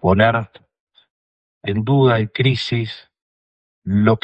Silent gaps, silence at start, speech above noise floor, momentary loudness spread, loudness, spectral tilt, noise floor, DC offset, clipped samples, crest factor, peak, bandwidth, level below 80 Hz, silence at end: 0.80-0.87 s, 1.10-1.61 s, 3.22-3.82 s; 0.05 s; over 74 dB; 17 LU; -18 LUFS; -8 dB/octave; under -90 dBFS; under 0.1%; under 0.1%; 18 dB; 0 dBFS; 8.2 kHz; -52 dBFS; 0.05 s